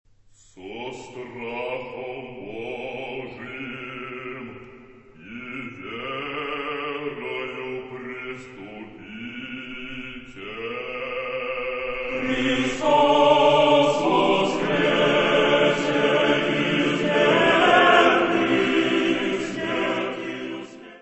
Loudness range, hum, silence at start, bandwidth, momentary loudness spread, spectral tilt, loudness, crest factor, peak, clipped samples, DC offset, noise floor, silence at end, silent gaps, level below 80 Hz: 16 LU; none; 0.55 s; 8.4 kHz; 19 LU; -5 dB/octave; -21 LUFS; 22 dB; -2 dBFS; under 0.1%; under 0.1%; -54 dBFS; 0.05 s; none; -54 dBFS